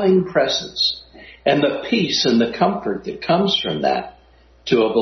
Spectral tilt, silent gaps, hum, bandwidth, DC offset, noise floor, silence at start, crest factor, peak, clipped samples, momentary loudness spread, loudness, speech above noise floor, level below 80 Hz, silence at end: -5 dB/octave; none; none; 6.4 kHz; under 0.1%; -51 dBFS; 0 s; 16 dB; -2 dBFS; under 0.1%; 9 LU; -19 LUFS; 33 dB; -52 dBFS; 0 s